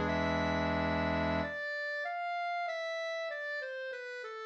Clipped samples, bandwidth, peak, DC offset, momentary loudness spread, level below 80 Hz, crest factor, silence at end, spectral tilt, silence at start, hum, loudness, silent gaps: under 0.1%; 8.4 kHz; -20 dBFS; under 0.1%; 8 LU; -52 dBFS; 16 dB; 0 s; -6 dB/octave; 0 s; none; -35 LUFS; none